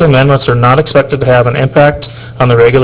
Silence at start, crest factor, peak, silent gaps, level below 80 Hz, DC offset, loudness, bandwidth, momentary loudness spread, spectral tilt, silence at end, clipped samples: 0 s; 8 dB; 0 dBFS; none; -32 dBFS; under 0.1%; -8 LUFS; 4 kHz; 5 LU; -11 dB/octave; 0 s; 0.6%